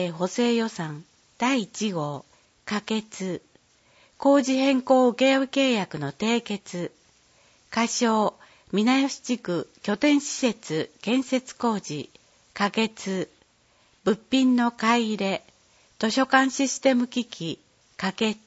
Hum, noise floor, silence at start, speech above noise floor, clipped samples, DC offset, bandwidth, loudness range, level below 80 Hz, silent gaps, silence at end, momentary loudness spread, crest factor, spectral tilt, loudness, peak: none; -62 dBFS; 0 s; 38 dB; under 0.1%; under 0.1%; 8 kHz; 5 LU; -70 dBFS; none; 0.1 s; 13 LU; 20 dB; -4 dB/octave; -25 LUFS; -6 dBFS